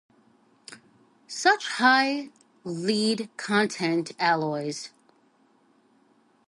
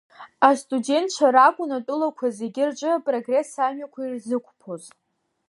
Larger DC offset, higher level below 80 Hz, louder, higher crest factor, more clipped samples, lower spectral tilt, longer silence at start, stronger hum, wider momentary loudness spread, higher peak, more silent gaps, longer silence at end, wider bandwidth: neither; about the same, -78 dBFS vs -82 dBFS; second, -25 LUFS vs -22 LUFS; about the same, 22 dB vs 20 dB; neither; about the same, -3.5 dB/octave vs -3.5 dB/octave; first, 0.7 s vs 0.2 s; neither; first, 22 LU vs 15 LU; second, -6 dBFS vs -2 dBFS; neither; first, 1.6 s vs 0.6 s; about the same, 11.5 kHz vs 11.5 kHz